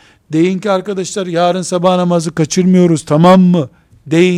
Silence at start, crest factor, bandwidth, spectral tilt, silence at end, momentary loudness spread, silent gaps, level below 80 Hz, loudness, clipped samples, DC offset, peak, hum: 0.3 s; 12 dB; 11 kHz; -6.5 dB/octave; 0 s; 10 LU; none; -52 dBFS; -12 LUFS; under 0.1%; under 0.1%; 0 dBFS; none